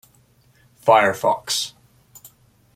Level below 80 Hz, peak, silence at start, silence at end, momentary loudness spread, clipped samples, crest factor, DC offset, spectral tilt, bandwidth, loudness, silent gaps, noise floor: -64 dBFS; -2 dBFS; 0.85 s; 1.05 s; 8 LU; under 0.1%; 20 dB; under 0.1%; -2.5 dB/octave; 16 kHz; -19 LUFS; none; -57 dBFS